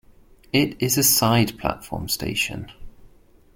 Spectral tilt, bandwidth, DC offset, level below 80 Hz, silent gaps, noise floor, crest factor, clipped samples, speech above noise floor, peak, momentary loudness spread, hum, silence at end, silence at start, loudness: -3.5 dB/octave; 17 kHz; under 0.1%; -46 dBFS; none; -52 dBFS; 20 dB; under 0.1%; 30 dB; -4 dBFS; 14 LU; none; 0.5 s; 0.55 s; -21 LUFS